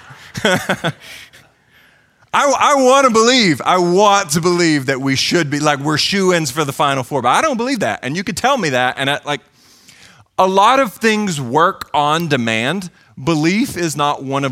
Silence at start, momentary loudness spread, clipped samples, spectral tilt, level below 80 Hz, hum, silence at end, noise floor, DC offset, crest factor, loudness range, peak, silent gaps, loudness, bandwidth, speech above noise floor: 0.1 s; 10 LU; under 0.1%; -4 dB/octave; -54 dBFS; none; 0 s; -52 dBFS; under 0.1%; 16 dB; 4 LU; 0 dBFS; none; -15 LUFS; 16.5 kHz; 37 dB